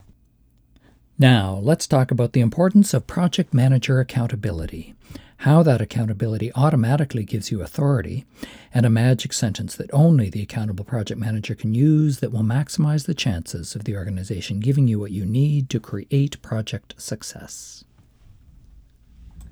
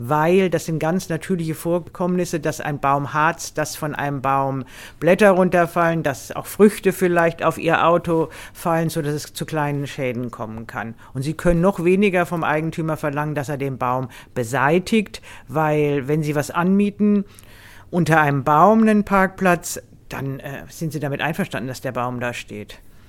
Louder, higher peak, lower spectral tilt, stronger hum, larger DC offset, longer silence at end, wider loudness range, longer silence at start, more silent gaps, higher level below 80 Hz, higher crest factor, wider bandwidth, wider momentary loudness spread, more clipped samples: about the same, -21 LUFS vs -20 LUFS; second, -4 dBFS vs 0 dBFS; about the same, -6.5 dB/octave vs -6 dB/octave; neither; neither; about the same, 0 s vs 0.1 s; about the same, 5 LU vs 5 LU; first, 1.2 s vs 0 s; neither; about the same, -48 dBFS vs -44 dBFS; about the same, 18 dB vs 20 dB; about the same, 15.5 kHz vs 17 kHz; about the same, 15 LU vs 13 LU; neither